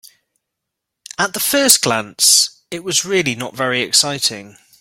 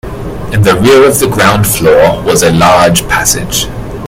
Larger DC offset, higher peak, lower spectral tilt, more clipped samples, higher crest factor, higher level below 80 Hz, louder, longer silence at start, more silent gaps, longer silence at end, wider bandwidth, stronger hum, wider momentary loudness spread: neither; about the same, 0 dBFS vs 0 dBFS; second, -1 dB/octave vs -4 dB/octave; second, under 0.1% vs 1%; first, 18 dB vs 8 dB; second, -60 dBFS vs -26 dBFS; second, -14 LUFS vs -7 LUFS; first, 1.2 s vs 0.05 s; neither; first, 0.3 s vs 0 s; second, 17 kHz vs over 20 kHz; neither; about the same, 10 LU vs 9 LU